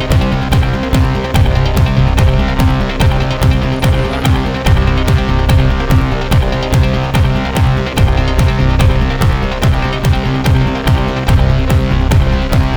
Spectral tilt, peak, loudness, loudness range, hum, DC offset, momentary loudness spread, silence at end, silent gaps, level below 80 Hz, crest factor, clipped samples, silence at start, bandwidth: -6.5 dB/octave; 0 dBFS; -13 LUFS; 0 LU; none; under 0.1%; 2 LU; 0 s; none; -16 dBFS; 10 dB; under 0.1%; 0 s; over 20 kHz